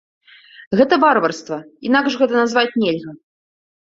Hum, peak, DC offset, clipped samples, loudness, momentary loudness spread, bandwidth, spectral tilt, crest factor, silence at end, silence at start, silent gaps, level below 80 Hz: none; -2 dBFS; under 0.1%; under 0.1%; -17 LUFS; 14 LU; 7.8 kHz; -5 dB/octave; 18 dB; 0.7 s; 0.6 s; 0.67-0.71 s; -62 dBFS